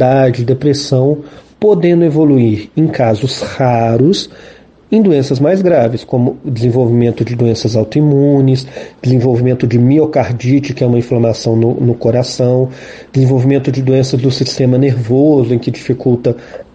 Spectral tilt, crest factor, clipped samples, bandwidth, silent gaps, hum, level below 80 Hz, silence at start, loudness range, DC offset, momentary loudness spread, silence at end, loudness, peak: -7.5 dB/octave; 10 dB; under 0.1%; 8.8 kHz; none; none; -46 dBFS; 0 s; 1 LU; under 0.1%; 6 LU; 0.1 s; -12 LUFS; 0 dBFS